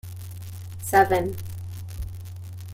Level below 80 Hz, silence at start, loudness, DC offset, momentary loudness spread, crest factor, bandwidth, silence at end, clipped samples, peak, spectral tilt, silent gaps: -44 dBFS; 0.05 s; -25 LUFS; under 0.1%; 19 LU; 22 dB; 16.5 kHz; 0 s; under 0.1%; -4 dBFS; -5.5 dB/octave; none